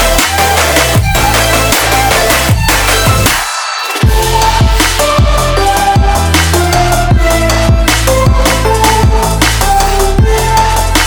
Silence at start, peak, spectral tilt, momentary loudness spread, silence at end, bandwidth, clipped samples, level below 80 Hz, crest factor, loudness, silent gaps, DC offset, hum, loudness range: 0 s; 0 dBFS; -3.5 dB/octave; 2 LU; 0 s; over 20 kHz; under 0.1%; -14 dBFS; 8 dB; -9 LUFS; none; under 0.1%; none; 1 LU